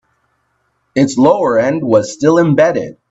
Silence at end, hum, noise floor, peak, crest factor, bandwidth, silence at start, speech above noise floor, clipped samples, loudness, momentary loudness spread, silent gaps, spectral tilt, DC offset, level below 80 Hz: 0.2 s; none; -63 dBFS; 0 dBFS; 14 dB; 8 kHz; 0.95 s; 51 dB; under 0.1%; -12 LUFS; 5 LU; none; -6.5 dB/octave; under 0.1%; -54 dBFS